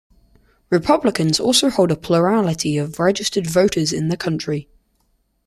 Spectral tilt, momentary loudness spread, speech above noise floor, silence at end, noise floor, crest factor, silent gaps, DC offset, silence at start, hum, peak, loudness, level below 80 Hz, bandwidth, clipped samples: -4.5 dB/octave; 7 LU; 47 dB; 0.85 s; -65 dBFS; 16 dB; none; under 0.1%; 0.7 s; none; -2 dBFS; -18 LUFS; -50 dBFS; 15 kHz; under 0.1%